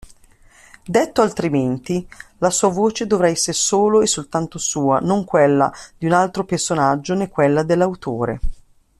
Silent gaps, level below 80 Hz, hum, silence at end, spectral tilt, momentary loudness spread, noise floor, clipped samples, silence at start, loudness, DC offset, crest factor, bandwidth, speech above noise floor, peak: none; -38 dBFS; none; 0.45 s; -4.5 dB/octave; 8 LU; -49 dBFS; under 0.1%; 0.85 s; -18 LUFS; under 0.1%; 16 dB; 14 kHz; 32 dB; -2 dBFS